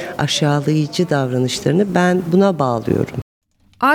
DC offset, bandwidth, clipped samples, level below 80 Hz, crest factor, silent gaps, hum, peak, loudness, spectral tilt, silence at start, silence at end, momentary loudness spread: under 0.1%; 17 kHz; under 0.1%; -52 dBFS; 16 dB; 3.22-3.41 s; none; -2 dBFS; -17 LUFS; -5.5 dB/octave; 0 s; 0 s; 5 LU